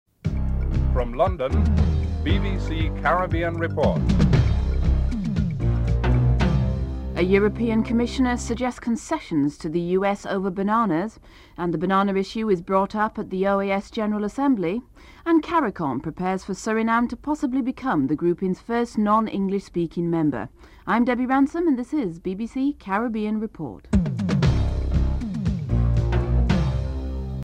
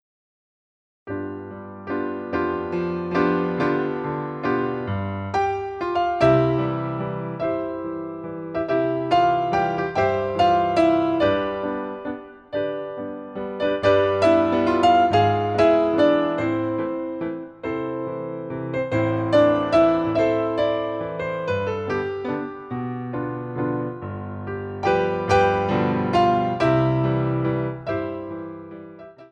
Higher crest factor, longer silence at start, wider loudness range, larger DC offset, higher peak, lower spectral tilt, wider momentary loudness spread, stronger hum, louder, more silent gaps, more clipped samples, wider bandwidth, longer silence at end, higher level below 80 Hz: about the same, 16 dB vs 16 dB; second, 0.25 s vs 1.05 s; second, 2 LU vs 7 LU; neither; about the same, -6 dBFS vs -6 dBFS; about the same, -7.5 dB/octave vs -7.5 dB/octave; second, 7 LU vs 13 LU; neither; about the same, -23 LUFS vs -22 LUFS; neither; neither; about the same, 9.8 kHz vs 9.4 kHz; about the same, 0 s vs 0.05 s; first, -28 dBFS vs -50 dBFS